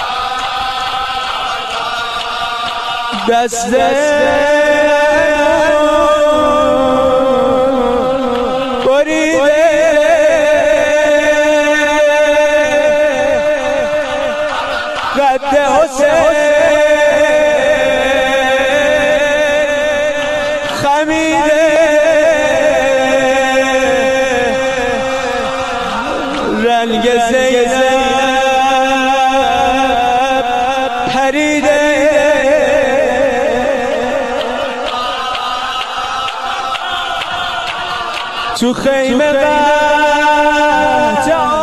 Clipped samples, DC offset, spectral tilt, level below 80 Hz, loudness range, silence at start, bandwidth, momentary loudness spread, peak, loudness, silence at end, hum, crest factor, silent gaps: under 0.1%; 1%; -3 dB/octave; -38 dBFS; 5 LU; 0 s; 14 kHz; 7 LU; 0 dBFS; -12 LUFS; 0 s; none; 12 dB; none